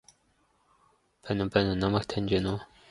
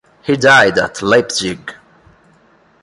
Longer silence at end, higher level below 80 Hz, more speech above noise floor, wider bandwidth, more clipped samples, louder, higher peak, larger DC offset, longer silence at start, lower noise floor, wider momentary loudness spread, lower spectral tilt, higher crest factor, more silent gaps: second, 0.25 s vs 1.1 s; about the same, -50 dBFS vs -50 dBFS; about the same, 41 dB vs 38 dB; about the same, 11.5 kHz vs 11.5 kHz; neither; second, -29 LUFS vs -12 LUFS; second, -8 dBFS vs 0 dBFS; neither; first, 1.25 s vs 0.25 s; first, -69 dBFS vs -51 dBFS; second, 9 LU vs 16 LU; first, -7 dB/octave vs -3.5 dB/octave; first, 24 dB vs 16 dB; neither